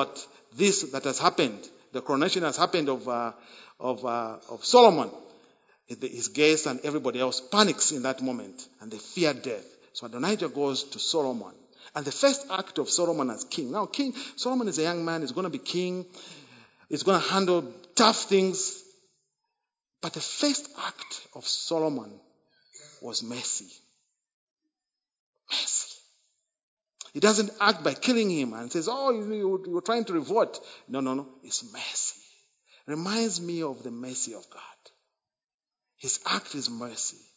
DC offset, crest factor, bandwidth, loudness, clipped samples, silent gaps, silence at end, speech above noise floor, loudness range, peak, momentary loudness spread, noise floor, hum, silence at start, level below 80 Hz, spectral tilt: under 0.1%; 26 dB; 8 kHz; -27 LUFS; under 0.1%; 24.34-24.56 s, 25.20-25.33 s, 26.63-26.77 s, 35.44-35.48 s, 35.54-35.59 s; 0.2 s; over 62 dB; 8 LU; -4 dBFS; 15 LU; under -90 dBFS; none; 0 s; -82 dBFS; -3 dB/octave